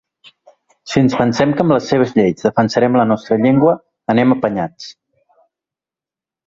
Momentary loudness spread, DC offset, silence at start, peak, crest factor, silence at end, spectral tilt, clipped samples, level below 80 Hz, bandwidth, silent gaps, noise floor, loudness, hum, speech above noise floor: 8 LU; under 0.1%; 0.85 s; 0 dBFS; 16 dB; 1.55 s; -7 dB/octave; under 0.1%; -52 dBFS; 7.6 kHz; none; -89 dBFS; -15 LUFS; none; 75 dB